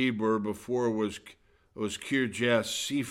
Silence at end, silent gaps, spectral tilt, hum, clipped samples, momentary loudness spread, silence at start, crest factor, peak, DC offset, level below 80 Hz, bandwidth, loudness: 0 s; none; -4 dB/octave; none; under 0.1%; 9 LU; 0 s; 16 dB; -14 dBFS; under 0.1%; -64 dBFS; 16.5 kHz; -30 LUFS